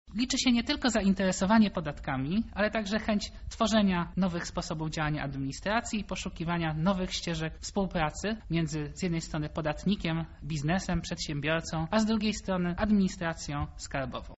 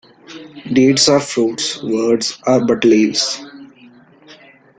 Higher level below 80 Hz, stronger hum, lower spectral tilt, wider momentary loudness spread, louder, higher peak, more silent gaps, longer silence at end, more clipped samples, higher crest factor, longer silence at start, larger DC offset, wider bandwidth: first, -46 dBFS vs -56 dBFS; neither; about the same, -5 dB/octave vs -4 dB/octave; second, 9 LU vs 14 LU; second, -30 LUFS vs -14 LUFS; second, -12 dBFS vs -2 dBFS; neither; second, 0 s vs 0.45 s; neither; about the same, 18 dB vs 16 dB; second, 0.05 s vs 0.3 s; neither; second, 8 kHz vs 9.6 kHz